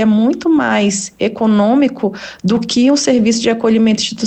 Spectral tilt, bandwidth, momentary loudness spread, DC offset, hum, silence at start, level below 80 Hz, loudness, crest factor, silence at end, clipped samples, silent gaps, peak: -4.5 dB/octave; 9 kHz; 6 LU; under 0.1%; none; 0 s; -52 dBFS; -13 LUFS; 12 dB; 0 s; under 0.1%; none; -2 dBFS